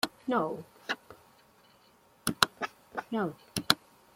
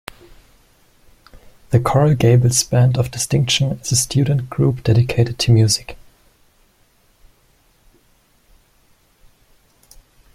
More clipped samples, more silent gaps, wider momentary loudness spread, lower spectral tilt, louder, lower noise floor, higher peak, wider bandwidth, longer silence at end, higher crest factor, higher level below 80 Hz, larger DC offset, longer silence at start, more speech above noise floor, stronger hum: neither; neither; first, 11 LU vs 6 LU; second, -3 dB/octave vs -5 dB/octave; second, -32 LUFS vs -16 LUFS; first, -63 dBFS vs -57 dBFS; about the same, 0 dBFS vs -2 dBFS; about the same, 16.5 kHz vs 15.5 kHz; second, 0.4 s vs 4.4 s; first, 34 dB vs 18 dB; second, -66 dBFS vs -44 dBFS; neither; second, 0.05 s vs 1.7 s; second, 30 dB vs 41 dB; neither